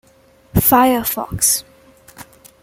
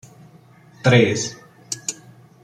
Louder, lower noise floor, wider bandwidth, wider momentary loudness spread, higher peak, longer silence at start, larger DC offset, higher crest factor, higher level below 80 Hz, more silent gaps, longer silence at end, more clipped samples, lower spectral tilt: first, -15 LUFS vs -20 LUFS; about the same, -51 dBFS vs -49 dBFS; first, 17 kHz vs 14 kHz; second, 9 LU vs 16 LU; about the same, 0 dBFS vs -2 dBFS; second, 0.55 s vs 0.85 s; neither; about the same, 18 dB vs 20 dB; first, -38 dBFS vs -58 dBFS; neither; about the same, 0.4 s vs 0.5 s; neither; about the same, -3.5 dB/octave vs -4.5 dB/octave